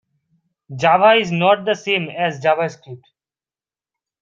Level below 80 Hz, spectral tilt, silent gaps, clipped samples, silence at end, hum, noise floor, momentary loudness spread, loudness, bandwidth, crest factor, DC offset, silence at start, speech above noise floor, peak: -64 dBFS; -5 dB/octave; none; under 0.1%; 1.25 s; none; under -90 dBFS; 12 LU; -17 LUFS; 7.6 kHz; 18 dB; under 0.1%; 0.7 s; over 73 dB; -2 dBFS